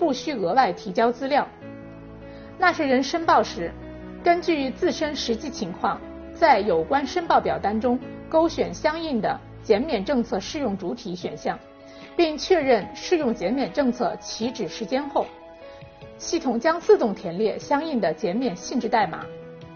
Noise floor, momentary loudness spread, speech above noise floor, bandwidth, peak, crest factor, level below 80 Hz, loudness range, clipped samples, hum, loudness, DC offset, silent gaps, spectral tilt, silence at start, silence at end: -43 dBFS; 18 LU; 20 dB; 6.8 kHz; -4 dBFS; 20 dB; -50 dBFS; 4 LU; under 0.1%; none; -24 LUFS; under 0.1%; none; -3.5 dB/octave; 0 s; 0 s